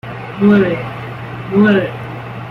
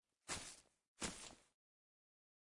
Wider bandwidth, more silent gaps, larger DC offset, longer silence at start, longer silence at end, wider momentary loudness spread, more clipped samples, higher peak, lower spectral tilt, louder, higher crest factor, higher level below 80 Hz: second, 5.2 kHz vs 12 kHz; second, none vs 0.88-0.96 s; neither; second, 0.05 s vs 0.25 s; second, 0 s vs 1.15 s; about the same, 15 LU vs 14 LU; neither; first, -2 dBFS vs -30 dBFS; first, -8.5 dB/octave vs -1.5 dB/octave; first, -14 LUFS vs -50 LUFS; second, 14 dB vs 26 dB; first, -46 dBFS vs -72 dBFS